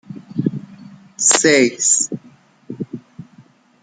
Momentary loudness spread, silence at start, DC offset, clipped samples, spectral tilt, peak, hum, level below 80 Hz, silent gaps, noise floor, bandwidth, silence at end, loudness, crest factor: 21 LU; 0.1 s; under 0.1%; under 0.1%; -2.5 dB/octave; 0 dBFS; none; -64 dBFS; none; -49 dBFS; 10 kHz; 0.6 s; -15 LUFS; 20 dB